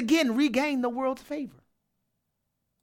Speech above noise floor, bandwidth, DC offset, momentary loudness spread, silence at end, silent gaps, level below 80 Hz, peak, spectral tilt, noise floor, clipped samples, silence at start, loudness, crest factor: 53 dB; 16.5 kHz; under 0.1%; 13 LU; 1.35 s; none; -66 dBFS; -12 dBFS; -4 dB/octave; -80 dBFS; under 0.1%; 0 s; -27 LUFS; 16 dB